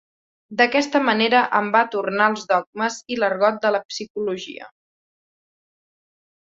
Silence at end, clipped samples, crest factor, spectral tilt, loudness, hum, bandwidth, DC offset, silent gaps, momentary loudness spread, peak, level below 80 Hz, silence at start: 1.9 s; under 0.1%; 20 dB; -3.5 dB/octave; -20 LUFS; none; 7.8 kHz; under 0.1%; 2.67-2.73 s, 3.85-3.89 s, 4.10-4.15 s; 12 LU; -2 dBFS; -70 dBFS; 0.5 s